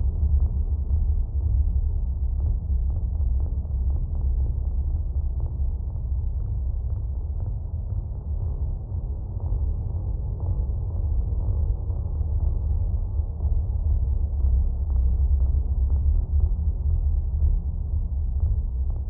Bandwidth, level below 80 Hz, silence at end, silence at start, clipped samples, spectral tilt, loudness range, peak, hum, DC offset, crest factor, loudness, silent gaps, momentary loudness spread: 1.2 kHz; -24 dBFS; 0 s; 0 s; under 0.1%; -15.5 dB/octave; 5 LU; -10 dBFS; none; under 0.1%; 14 dB; -27 LUFS; none; 6 LU